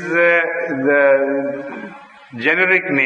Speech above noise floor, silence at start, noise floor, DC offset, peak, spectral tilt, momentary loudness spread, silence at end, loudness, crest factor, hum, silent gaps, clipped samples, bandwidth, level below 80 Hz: 20 dB; 0 s; -36 dBFS; under 0.1%; -2 dBFS; -6.5 dB/octave; 18 LU; 0 s; -15 LUFS; 16 dB; none; none; under 0.1%; 6.8 kHz; -70 dBFS